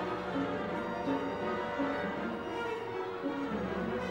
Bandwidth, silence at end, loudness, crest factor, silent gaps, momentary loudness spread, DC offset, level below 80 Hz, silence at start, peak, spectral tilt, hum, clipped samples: 16 kHz; 0 s; -35 LUFS; 14 dB; none; 3 LU; under 0.1%; -58 dBFS; 0 s; -20 dBFS; -6.5 dB/octave; none; under 0.1%